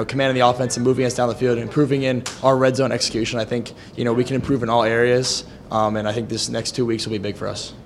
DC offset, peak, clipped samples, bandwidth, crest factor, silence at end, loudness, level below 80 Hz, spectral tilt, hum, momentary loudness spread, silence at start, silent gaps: under 0.1%; 0 dBFS; under 0.1%; 13 kHz; 20 dB; 0 s; -20 LUFS; -48 dBFS; -5 dB/octave; none; 9 LU; 0 s; none